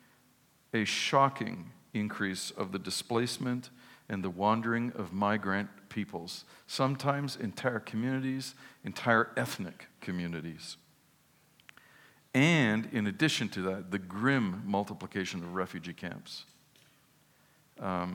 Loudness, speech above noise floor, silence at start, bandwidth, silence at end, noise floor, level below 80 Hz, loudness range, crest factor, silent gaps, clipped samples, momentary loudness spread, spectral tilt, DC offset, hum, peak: -32 LUFS; 34 dB; 0.75 s; 18.5 kHz; 0 s; -66 dBFS; -78 dBFS; 5 LU; 22 dB; none; under 0.1%; 15 LU; -5 dB/octave; under 0.1%; none; -10 dBFS